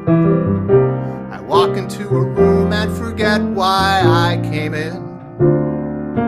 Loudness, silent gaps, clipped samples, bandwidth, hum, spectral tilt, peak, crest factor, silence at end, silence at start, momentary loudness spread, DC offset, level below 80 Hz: -16 LUFS; none; under 0.1%; 13.5 kHz; none; -7 dB/octave; 0 dBFS; 14 dB; 0 s; 0 s; 10 LU; under 0.1%; -40 dBFS